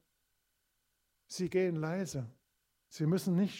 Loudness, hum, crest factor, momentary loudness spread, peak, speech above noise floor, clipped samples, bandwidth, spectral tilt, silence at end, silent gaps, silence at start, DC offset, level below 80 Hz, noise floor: -34 LUFS; none; 16 dB; 16 LU; -20 dBFS; 47 dB; under 0.1%; 16 kHz; -6.5 dB/octave; 0 s; none; 1.3 s; under 0.1%; -74 dBFS; -80 dBFS